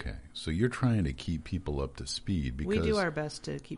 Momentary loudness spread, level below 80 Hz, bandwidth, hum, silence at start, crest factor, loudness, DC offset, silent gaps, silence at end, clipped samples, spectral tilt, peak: 8 LU; -42 dBFS; 10.5 kHz; none; 0 s; 18 dB; -32 LUFS; under 0.1%; none; 0 s; under 0.1%; -6 dB/octave; -14 dBFS